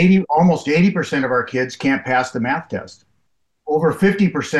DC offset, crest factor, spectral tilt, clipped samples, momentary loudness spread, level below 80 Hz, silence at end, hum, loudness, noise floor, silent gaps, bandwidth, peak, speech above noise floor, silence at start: under 0.1%; 14 dB; -7 dB/octave; under 0.1%; 8 LU; -54 dBFS; 0 s; none; -18 LUFS; -70 dBFS; none; 12 kHz; -4 dBFS; 53 dB; 0 s